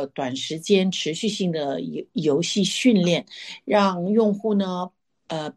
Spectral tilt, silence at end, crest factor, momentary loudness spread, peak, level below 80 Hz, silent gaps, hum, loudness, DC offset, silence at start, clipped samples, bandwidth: -5 dB/octave; 0.05 s; 16 dB; 12 LU; -6 dBFS; -68 dBFS; none; none; -22 LUFS; under 0.1%; 0 s; under 0.1%; 12.5 kHz